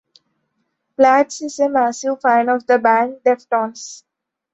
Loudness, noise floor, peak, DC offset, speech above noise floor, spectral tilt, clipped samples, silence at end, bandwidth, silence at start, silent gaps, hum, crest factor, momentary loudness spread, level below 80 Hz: -16 LUFS; -71 dBFS; -2 dBFS; under 0.1%; 55 dB; -3.5 dB/octave; under 0.1%; 0.55 s; 8.2 kHz; 1 s; none; none; 16 dB; 12 LU; -70 dBFS